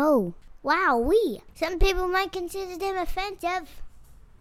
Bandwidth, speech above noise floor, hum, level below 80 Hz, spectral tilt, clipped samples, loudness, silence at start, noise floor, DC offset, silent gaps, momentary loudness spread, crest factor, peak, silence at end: 16 kHz; 23 dB; none; -34 dBFS; -5 dB/octave; under 0.1%; -26 LUFS; 0 s; -48 dBFS; under 0.1%; none; 11 LU; 16 dB; -10 dBFS; 0.35 s